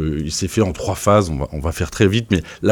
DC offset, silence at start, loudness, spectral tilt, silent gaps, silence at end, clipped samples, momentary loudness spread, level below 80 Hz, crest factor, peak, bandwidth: under 0.1%; 0 s; -19 LUFS; -5.5 dB/octave; none; 0 s; under 0.1%; 8 LU; -32 dBFS; 16 dB; -2 dBFS; 18 kHz